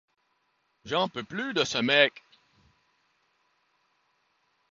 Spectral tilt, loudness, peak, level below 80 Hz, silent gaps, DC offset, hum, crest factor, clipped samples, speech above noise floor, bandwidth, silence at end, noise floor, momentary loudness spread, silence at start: -3.5 dB/octave; -26 LUFS; -6 dBFS; -72 dBFS; none; under 0.1%; none; 26 dB; under 0.1%; 47 dB; 7.6 kHz; 2.6 s; -74 dBFS; 10 LU; 0.85 s